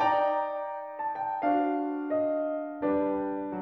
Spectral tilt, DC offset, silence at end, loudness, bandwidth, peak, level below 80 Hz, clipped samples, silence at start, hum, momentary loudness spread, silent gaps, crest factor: -7.5 dB/octave; under 0.1%; 0 s; -30 LUFS; 5.8 kHz; -14 dBFS; -66 dBFS; under 0.1%; 0 s; none; 7 LU; none; 14 dB